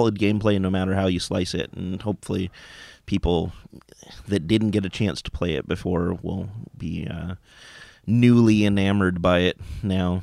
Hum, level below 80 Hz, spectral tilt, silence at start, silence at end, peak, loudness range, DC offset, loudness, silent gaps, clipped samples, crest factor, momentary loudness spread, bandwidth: none; -42 dBFS; -6.5 dB/octave; 0 s; 0 s; -4 dBFS; 7 LU; under 0.1%; -23 LUFS; none; under 0.1%; 18 dB; 16 LU; 12.5 kHz